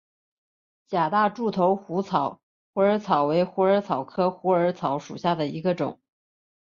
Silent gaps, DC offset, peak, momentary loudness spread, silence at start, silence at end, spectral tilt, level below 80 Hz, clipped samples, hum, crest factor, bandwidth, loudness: 2.43-2.73 s; under 0.1%; -8 dBFS; 7 LU; 0.9 s; 0.75 s; -7.5 dB/octave; -68 dBFS; under 0.1%; none; 18 dB; 7.2 kHz; -24 LUFS